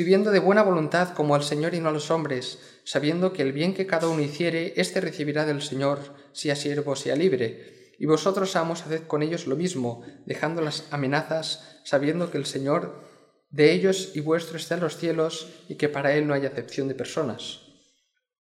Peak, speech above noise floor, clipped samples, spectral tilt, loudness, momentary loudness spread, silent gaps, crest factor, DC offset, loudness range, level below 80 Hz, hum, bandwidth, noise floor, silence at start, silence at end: -4 dBFS; 46 dB; under 0.1%; -5.5 dB/octave; -25 LUFS; 11 LU; none; 20 dB; under 0.1%; 3 LU; -74 dBFS; none; 14.5 kHz; -71 dBFS; 0 s; 0.9 s